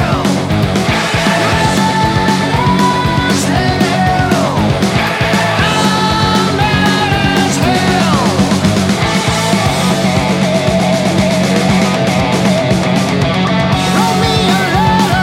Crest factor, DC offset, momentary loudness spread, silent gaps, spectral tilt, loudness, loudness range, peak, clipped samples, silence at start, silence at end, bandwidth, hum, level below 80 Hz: 12 dB; under 0.1%; 2 LU; none; -5 dB/octave; -12 LUFS; 1 LU; 0 dBFS; under 0.1%; 0 s; 0 s; 16 kHz; none; -30 dBFS